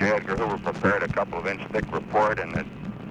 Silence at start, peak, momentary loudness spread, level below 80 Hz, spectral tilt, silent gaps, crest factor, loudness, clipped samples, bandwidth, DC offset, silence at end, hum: 0 s; -8 dBFS; 8 LU; -48 dBFS; -6.5 dB/octave; none; 18 dB; -26 LUFS; under 0.1%; 10 kHz; under 0.1%; 0 s; none